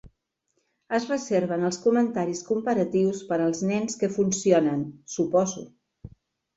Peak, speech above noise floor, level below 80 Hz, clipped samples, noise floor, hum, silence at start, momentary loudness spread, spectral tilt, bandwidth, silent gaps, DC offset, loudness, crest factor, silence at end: -6 dBFS; 51 dB; -62 dBFS; under 0.1%; -75 dBFS; none; 0.05 s; 7 LU; -5.5 dB/octave; 8.2 kHz; none; under 0.1%; -25 LUFS; 18 dB; 0.5 s